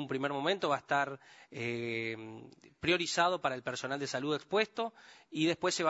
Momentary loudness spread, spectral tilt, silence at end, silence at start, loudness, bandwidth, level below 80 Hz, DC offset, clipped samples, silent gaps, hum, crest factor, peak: 13 LU; -4 dB/octave; 0 s; 0 s; -34 LUFS; 8 kHz; -72 dBFS; under 0.1%; under 0.1%; none; none; 20 dB; -14 dBFS